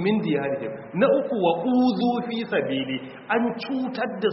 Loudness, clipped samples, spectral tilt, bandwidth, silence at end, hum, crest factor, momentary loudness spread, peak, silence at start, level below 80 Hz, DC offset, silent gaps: -24 LUFS; under 0.1%; -4.5 dB/octave; 5.8 kHz; 0 s; none; 16 dB; 8 LU; -8 dBFS; 0 s; -66 dBFS; under 0.1%; none